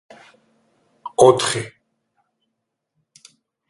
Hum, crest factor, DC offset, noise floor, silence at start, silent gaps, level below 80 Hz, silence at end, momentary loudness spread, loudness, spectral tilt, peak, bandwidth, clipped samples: none; 22 dB; under 0.1%; -77 dBFS; 1.05 s; none; -60 dBFS; 2 s; 23 LU; -17 LUFS; -4 dB/octave; 0 dBFS; 11.5 kHz; under 0.1%